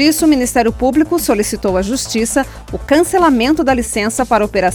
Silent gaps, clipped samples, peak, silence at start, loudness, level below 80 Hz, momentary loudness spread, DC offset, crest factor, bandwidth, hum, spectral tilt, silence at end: none; under 0.1%; 0 dBFS; 0 s; -14 LUFS; -32 dBFS; 5 LU; under 0.1%; 14 dB; 20 kHz; none; -4 dB/octave; 0 s